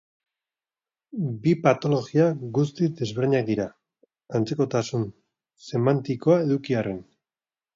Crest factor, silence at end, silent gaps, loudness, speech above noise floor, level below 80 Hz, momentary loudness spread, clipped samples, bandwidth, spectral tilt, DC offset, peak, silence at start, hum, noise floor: 20 dB; 0.75 s; none; -24 LUFS; over 67 dB; -64 dBFS; 10 LU; under 0.1%; 7.6 kHz; -7.5 dB/octave; under 0.1%; -6 dBFS; 1.15 s; none; under -90 dBFS